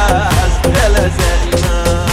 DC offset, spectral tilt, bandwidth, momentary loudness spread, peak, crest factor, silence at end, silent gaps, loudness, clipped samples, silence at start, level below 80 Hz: 0.9%; -4.5 dB/octave; 16 kHz; 3 LU; 0 dBFS; 12 dB; 0 s; none; -13 LUFS; under 0.1%; 0 s; -16 dBFS